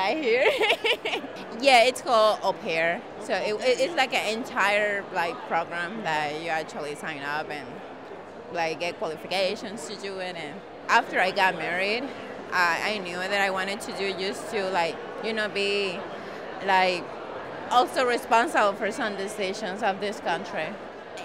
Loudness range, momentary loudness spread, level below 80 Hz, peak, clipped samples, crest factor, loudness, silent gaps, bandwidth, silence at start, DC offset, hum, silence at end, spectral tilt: 8 LU; 14 LU; -68 dBFS; -8 dBFS; under 0.1%; 18 dB; -26 LUFS; none; 16 kHz; 0 s; 0.1%; none; 0 s; -3 dB/octave